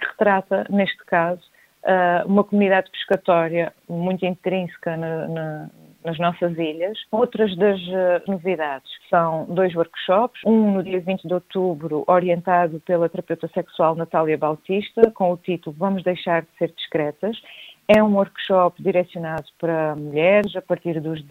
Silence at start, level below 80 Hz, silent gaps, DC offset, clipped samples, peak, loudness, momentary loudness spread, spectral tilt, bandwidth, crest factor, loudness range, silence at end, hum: 0 s; -62 dBFS; none; under 0.1%; under 0.1%; 0 dBFS; -21 LUFS; 10 LU; -8 dB/octave; 15.5 kHz; 20 dB; 4 LU; 0.05 s; none